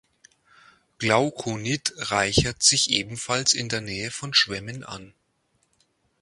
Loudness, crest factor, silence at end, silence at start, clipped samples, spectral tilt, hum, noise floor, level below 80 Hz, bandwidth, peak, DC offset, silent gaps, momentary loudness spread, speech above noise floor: -22 LUFS; 24 dB; 1.15 s; 1 s; under 0.1%; -2.5 dB/octave; none; -70 dBFS; -48 dBFS; 11.5 kHz; -2 dBFS; under 0.1%; none; 14 LU; 45 dB